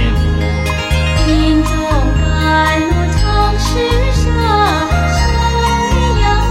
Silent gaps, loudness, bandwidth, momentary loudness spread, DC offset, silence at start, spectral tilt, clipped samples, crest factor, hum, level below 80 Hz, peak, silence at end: none; -13 LUFS; 14 kHz; 3 LU; under 0.1%; 0 s; -5.5 dB/octave; under 0.1%; 10 dB; none; -16 dBFS; -2 dBFS; 0 s